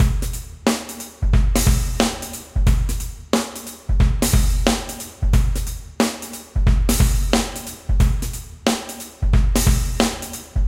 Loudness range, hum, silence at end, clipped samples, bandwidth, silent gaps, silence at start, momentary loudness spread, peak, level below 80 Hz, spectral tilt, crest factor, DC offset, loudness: 1 LU; none; 0 s; under 0.1%; 16.5 kHz; none; 0 s; 11 LU; 0 dBFS; -20 dBFS; -4.5 dB/octave; 18 dB; under 0.1%; -21 LUFS